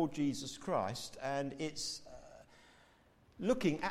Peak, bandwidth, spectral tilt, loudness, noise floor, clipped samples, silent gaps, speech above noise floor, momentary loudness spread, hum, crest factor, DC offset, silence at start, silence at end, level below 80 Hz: -20 dBFS; 15.5 kHz; -4.5 dB/octave; -38 LUFS; -67 dBFS; under 0.1%; none; 30 dB; 22 LU; none; 20 dB; under 0.1%; 0 s; 0 s; -64 dBFS